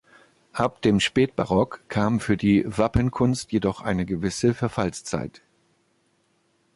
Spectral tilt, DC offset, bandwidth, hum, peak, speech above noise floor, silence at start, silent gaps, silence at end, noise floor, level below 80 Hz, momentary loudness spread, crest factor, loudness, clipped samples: -6 dB/octave; under 0.1%; 11.5 kHz; none; -6 dBFS; 44 dB; 0.55 s; none; 1.45 s; -67 dBFS; -44 dBFS; 7 LU; 18 dB; -24 LUFS; under 0.1%